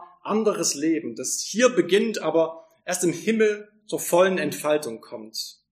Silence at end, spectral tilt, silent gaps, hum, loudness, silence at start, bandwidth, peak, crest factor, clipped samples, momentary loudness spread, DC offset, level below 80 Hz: 0.2 s; -3.5 dB/octave; none; none; -23 LUFS; 0 s; 15.5 kHz; -4 dBFS; 20 dB; under 0.1%; 13 LU; under 0.1%; -78 dBFS